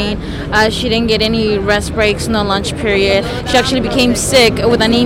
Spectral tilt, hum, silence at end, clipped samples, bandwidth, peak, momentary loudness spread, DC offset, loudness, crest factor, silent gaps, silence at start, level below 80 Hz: -4 dB/octave; none; 0 s; under 0.1%; 17 kHz; -2 dBFS; 6 LU; under 0.1%; -13 LUFS; 10 dB; none; 0 s; -28 dBFS